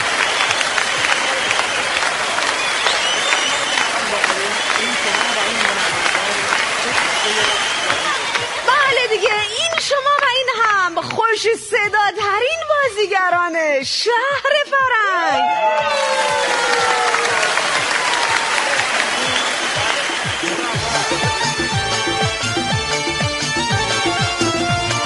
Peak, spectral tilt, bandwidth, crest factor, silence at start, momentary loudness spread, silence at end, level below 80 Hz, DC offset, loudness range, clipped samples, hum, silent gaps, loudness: 0 dBFS; -2 dB/octave; 11.5 kHz; 18 dB; 0 s; 3 LU; 0 s; -46 dBFS; under 0.1%; 2 LU; under 0.1%; none; none; -16 LUFS